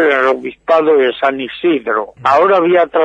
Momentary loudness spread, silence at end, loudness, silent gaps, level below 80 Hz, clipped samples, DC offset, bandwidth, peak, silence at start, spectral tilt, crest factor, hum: 7 LU; 0 s; -13 LUFS; none; -56 dBFS; under 0.1%; under 0.1%; 8 kHz; 0 dBFS; 0 s; -6 dB/octave; 12 dB; none